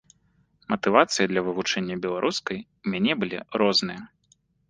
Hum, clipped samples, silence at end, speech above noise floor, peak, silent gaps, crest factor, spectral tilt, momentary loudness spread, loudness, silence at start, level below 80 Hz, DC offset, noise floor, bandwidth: none; under 0.1%; 0.65 s; 41 dB; -2 dBFS; none; 24 dB; -4 dB/octave; 11 LU; -25 LUFS; 0.7 s; -64 dBFS; under 0.1%; -66 dBFS; 10 kHz